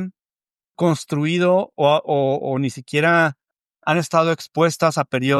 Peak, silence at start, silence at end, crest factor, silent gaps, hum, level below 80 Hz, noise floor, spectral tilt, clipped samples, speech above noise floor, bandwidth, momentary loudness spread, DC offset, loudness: -2 dBFS; 0 s; 0 s; 16 dB; none; none; -70 dBFS; under -90 dBFS; -5.5 dB/octave; under 0.1%; over 72 dB; 14 kHz; 6 LU; under 0.1%; -19 LUFS